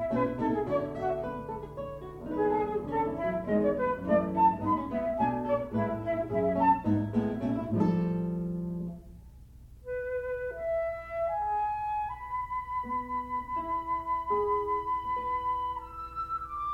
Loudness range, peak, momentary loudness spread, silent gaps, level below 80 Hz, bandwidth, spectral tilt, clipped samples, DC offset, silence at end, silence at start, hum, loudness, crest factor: 5 LU; -14 dBFS; 10 LU; none; -52 dBFS; 9.4 kHz; -9.5 dB/octave; under 0.1%; under 0.1%; 0 s; 0 s; 60 Hz at -55 dBFS; -31 LUFS; 18 dB